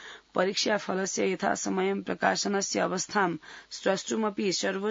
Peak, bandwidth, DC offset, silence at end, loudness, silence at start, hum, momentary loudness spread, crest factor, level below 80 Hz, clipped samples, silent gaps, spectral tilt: -8 dBFS; 7.8 kHz; under 0.1%; 0 s; -28 LUFS; 0 s; none; 4 LU; 20 dB; -72 dBFS; under 0.1%; none; -3.5 dB/octave